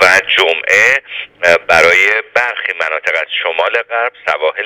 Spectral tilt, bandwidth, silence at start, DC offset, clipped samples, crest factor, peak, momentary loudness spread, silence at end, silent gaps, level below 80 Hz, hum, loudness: -1 dB/octave; over 20 kHz; 0 s; under 0.1%; 0.4%; 12 dB; 0 dBFS; 8 LU; 0 s; none; -52 dBFS; none; -11 LUFS